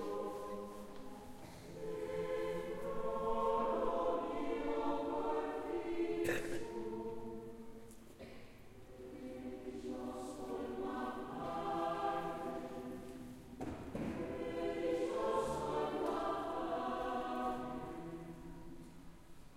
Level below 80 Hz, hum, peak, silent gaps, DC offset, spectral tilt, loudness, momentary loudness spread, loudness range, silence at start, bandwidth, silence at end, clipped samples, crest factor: -60 dBFS; none; -24 dBFS; none; under 0.1%; -6 dB/octave; -41 LUFS; 17 LU; 8 LU; 0 s; 16 kHz; 0 s; under 0.1%; 16 dB